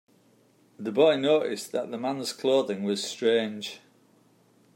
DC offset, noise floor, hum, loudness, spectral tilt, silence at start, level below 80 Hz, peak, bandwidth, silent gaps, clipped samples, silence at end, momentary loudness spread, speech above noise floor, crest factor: under 0.1%; -62 dBFS; none; -26 LUFS; -4 dB/octave; 0.8 s; -82 dBFS; -8 dBFS; 16 kHz; none; under 0.1%; 1 s; 14 LU; 36 dB; 20 dB